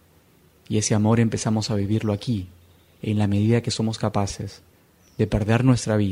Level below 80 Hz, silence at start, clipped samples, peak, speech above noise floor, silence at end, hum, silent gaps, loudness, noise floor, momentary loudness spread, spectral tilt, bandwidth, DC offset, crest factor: -46 dBFS; 0.7 s; under 0.1%; -4 dBFS; 35 dB; 0 s; none; none; -23 LUFS; -56 dBFS; 11 LU; -6 dB/octave; 11.5 kHz; under 0.1%; 18 dB